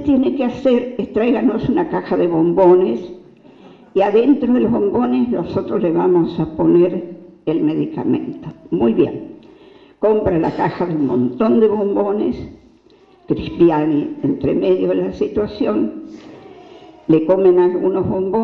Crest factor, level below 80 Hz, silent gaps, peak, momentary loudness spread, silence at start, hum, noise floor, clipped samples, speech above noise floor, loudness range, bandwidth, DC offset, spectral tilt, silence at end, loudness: 14 dB; -46 dBFS; none; -2 dBFS; 11 LU; 0 s; none; -49 dBFS; under 0.1%; 34 dB; 3 LU; 5.4 kHz; under 0.1%; -9.5 dB/octave; 0 s; -17 LUFS